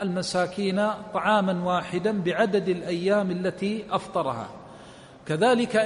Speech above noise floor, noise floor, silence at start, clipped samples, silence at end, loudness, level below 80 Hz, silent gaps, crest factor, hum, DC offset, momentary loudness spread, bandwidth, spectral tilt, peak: 22 dB; -47 dBFS; 0 s; under 0.1%; 0 s; -25 LUFS; -62 dBFS; none; 16 dB; none; under 0.1%; 12 LU; 10.5 kHz; -5.5 dB/octave; -10 dBFS